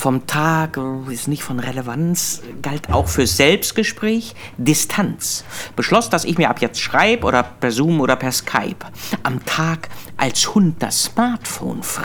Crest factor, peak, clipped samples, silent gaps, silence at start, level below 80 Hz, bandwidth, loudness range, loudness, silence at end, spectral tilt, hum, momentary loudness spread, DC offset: 18 dB; 0 dBFS; under 0.1%; none; 0 s; -40 dBFS; over 20 kHz; 2 LU; -18 LUFS; 0 s; -4 dB/octave; none; 10 LU; under 0.1%